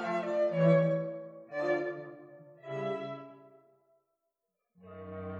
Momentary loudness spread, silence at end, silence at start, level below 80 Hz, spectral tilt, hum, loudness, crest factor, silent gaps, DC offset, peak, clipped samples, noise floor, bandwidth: 24 LU; 0 s; 0 s; -82 dBFS; -8.5 dB/octave; none; -32 LUFS; 20 dB; none; under 0.1%; -14 dBFS; under 0.1%; -85 dBFS; 7.4 kHz